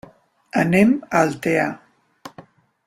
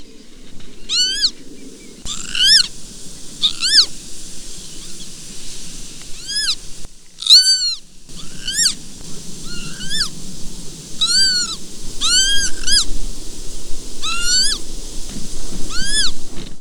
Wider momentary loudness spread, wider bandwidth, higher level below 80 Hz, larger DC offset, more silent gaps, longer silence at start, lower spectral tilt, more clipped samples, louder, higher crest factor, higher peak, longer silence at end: first, 24 LU vs 21 LU; second, 15 kHz vs 18 kHz; second, -58 dBFS vs -30 dBFS; neither; neither; first, 0.55 s vs 0 s; first, -6.5 dB/octave vs 0.5 dB/octave; neither; second, -19 LUFS vs -14 LUFS; about the same, 18 dB vs 16 dB; about the same, -2 dBFS vs 0 dBFS; first, 0.45 s vs 0 s